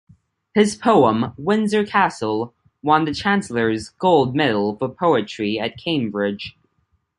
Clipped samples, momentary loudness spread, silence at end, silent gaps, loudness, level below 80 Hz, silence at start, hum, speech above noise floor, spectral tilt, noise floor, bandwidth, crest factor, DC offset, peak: under 0.1%; 8 LU; 0.7 s; none; -19 LUFS; -54 dBFS; 0.55 s; none; 48 dB; -5.5 dB/octave; -67 dBFS; 11.5 kHz; 18 dB; under 0.1%; 0 dBFS